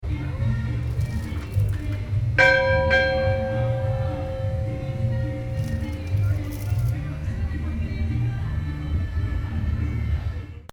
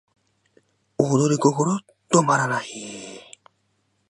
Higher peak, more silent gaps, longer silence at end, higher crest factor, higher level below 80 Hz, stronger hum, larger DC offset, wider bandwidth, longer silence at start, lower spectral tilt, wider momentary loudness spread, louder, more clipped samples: about the same, -4 dBFS vs -2 dBFS; neither; second, 0.05 s vs 0.9 s; about the same, 20 dB vs 22 dB; first, -32 dBFS vs -68 dBFS; neither; neither; first, 17 kHz vs 11.5 kHz; second, 0 s vs 1 s; first, -7 dB/octave vs -5 dB/octave; second, 10 LU vs 20 LU; second, -25 LUFS vs -21 LUFS; neither